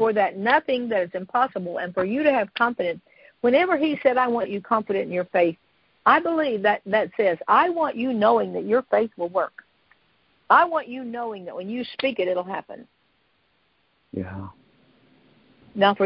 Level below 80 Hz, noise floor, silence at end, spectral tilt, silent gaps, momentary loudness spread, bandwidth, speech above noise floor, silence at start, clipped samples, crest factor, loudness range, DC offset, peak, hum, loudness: -62 dBFS; -67 dBFS; 0 s; -9.5 dB/octave; none; 14 LU; 5.6 kHz; 44 dB; 0 s; under 0.1%; 20 dB; 9 LU; under 0.1%; -4 dBFS; none; -23 LUFS